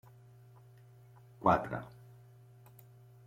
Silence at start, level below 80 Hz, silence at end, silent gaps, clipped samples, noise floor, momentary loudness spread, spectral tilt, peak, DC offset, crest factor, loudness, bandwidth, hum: 1.4 s; -64 dBFS; 1.4 s; none; under 0.1%; -58 dBFS; 28 LU; -8 dB/octave; -12 dBFS; under 0.1%; 26 dB; -33 LUFS; 16.5 kHz; none